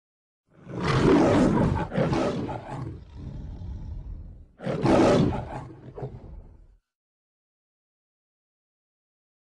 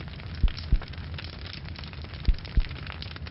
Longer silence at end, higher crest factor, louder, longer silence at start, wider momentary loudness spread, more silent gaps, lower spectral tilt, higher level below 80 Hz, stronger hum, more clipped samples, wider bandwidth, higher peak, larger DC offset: first, 3.1 s vs 0 s; about the same, 20 dB vs 18 dB; first, -23 LUFS vs -34 LUFS; first, 0.65 s vs 0 s; first, 21 LU vs 9 LU; neither; second, -7 dB/octave vs -8.5 dB/octave; second, -42 dBFS vs -30 dBFS; neither; neither; first, 11 kHz vs 5.8 kHz; first, -8 dBFS vs -12 dBFS; neither